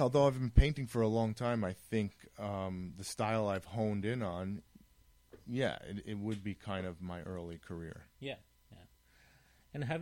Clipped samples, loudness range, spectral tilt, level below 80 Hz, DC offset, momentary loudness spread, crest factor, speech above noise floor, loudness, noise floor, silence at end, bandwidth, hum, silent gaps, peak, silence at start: under 0.1%; 10 LU; -6.5 dB/octave; -44 dBFS; under 0.1%; 15 LU; 24 dB; 31 dB; -37 LUFS; -66 dBFS; 0 s; 16.5 kHz; none; none; -12 dBFS; 0 s